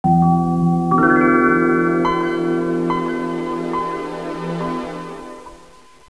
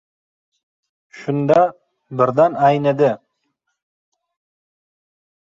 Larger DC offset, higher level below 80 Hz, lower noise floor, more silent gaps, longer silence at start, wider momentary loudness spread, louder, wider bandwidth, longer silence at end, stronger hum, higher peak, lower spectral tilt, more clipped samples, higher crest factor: first, 0.4% vs under 0.1%; first, -48 dBFS vs -62 dBFS; second, -46 dBFS vs -73 dBFS; neither; second, 0.05 s vs 1.15 s; about the same, 15 LU vs 15 LU; about the same, -18 LUFS vs -17 LUFS; first, 11 kHz vs 7.6 kHz; second, 0.55 s vs 2.4 s; neither; about the same, -2 dBFS vs -2 dBFS; about the same, -8 dB/octave vs -8 dB/octave; neither; about the same, 16 dB vs 18 dB